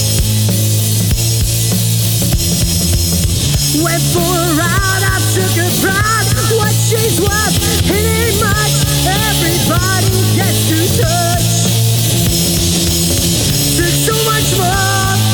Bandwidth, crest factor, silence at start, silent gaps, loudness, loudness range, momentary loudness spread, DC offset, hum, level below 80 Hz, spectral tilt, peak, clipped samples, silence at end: over 20 kHz; 10 dB; 0 s; none; -12 LUFS; 1 LU; 1 LU; under 0.1%; none; -26 dBFS; -3.5 dB/octave; -2 dBFS; under 0.1%; 0 s